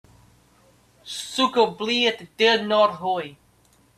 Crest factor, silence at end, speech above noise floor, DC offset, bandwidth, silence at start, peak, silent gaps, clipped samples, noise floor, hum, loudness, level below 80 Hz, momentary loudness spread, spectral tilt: 20 dB; 0.65 s; 37 dB; under 0.1%; 14 kHz; 1.05 s; -4 dBFS; none; under 0.1%; -59 dBFS; none; -21 LUFS; -66 dBFS; 13 LU; -3 dB/octave